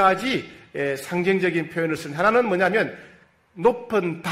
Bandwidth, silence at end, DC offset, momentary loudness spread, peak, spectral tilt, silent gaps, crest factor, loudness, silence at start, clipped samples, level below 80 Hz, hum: 16 kHz; 0 s; under 0.1%; 9 LU; -6 dBFS; -5.5 dB/octave; none; 18 dB; -22 LUFS; 0 s; under 0.1%; -60 dBFS; none